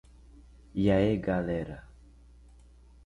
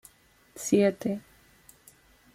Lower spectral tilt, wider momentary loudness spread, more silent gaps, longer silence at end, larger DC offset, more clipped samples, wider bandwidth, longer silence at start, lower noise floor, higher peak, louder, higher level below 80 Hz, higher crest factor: first, -8.5 dB/octave vs -5.5 dB/octave; about the same, 16 LU vs 15 LU; neither; about the same, 1.2 s vs 1.15 s; neither; neither; second, 10.5 kHz vs 16 kHz; second, 0.35 s vs 0.55 s; second, -55 dBFS vs -61 dBFS; about the same, -12 dBFS vs -12 dBFS; about the same, -29 LUFS vs -27 LUFS; first, -48 dBFS vs -66 dBFS; about the same, 18 dB vs 20 dB